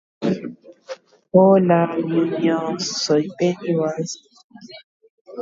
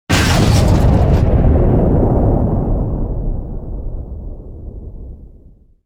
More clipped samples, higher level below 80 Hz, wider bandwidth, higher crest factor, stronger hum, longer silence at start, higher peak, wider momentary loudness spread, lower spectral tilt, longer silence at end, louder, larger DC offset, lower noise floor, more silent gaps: neither; second, -66 dBFS vs -18 dBFS; second, 7.8 kHz vs 16.5 kHz; about the same, 18 dB vs 14 dB; neither; about the same, 0.2 s vs 0.1 s; about the same, -2 dBFS vs 0 dBFS; first, 24 LU vs 21 LU; about the same, -6 dB/octave vs -6.5 dB/octave; second, 0 s vs 0.6 s; second, -19 LUFS vs -14 LUFS; neither; second, -38 dBFS vs -43 dBFS; first, 4.44-4.50 s, 4.84-5.00 s, 5.10-5.25 s vs none